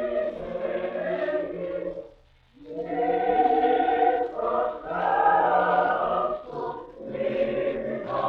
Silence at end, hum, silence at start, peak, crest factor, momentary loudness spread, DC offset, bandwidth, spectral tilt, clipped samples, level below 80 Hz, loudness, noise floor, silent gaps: 0 s; none; 0 s; -10 dBFS; 16 dB; 12 LU; under 0.1%; 5.4 kHz; -8 dB/octave; under 0.1%; -56 dBFS; -25 LUFS; -56 dBFS; none